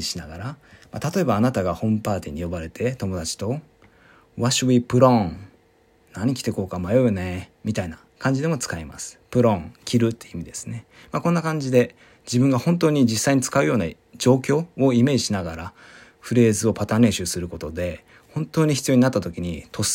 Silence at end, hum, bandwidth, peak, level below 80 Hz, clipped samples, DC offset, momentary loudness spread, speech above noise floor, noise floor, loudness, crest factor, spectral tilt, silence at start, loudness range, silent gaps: 0 s; none; 16.5 kHz; -2 dBFS; -52 dBFS; under 0.1%; under 0.1%; 15 LU; 37 dB; -58 dBFS; -22 LUFS; 20 dB; -5.5 dB/octave; 0 s; 5 LU; none